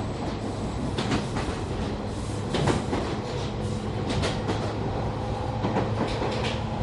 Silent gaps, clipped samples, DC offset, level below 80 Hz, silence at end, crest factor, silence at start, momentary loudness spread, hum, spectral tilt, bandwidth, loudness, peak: none; under 0.1%; under 0.1%; -38 dBFS; 0 s; 18 dB; 0 s; 4 LU; none; -6 dB/octave; 11.5 kHz; -29 LUFS; -10 dBFS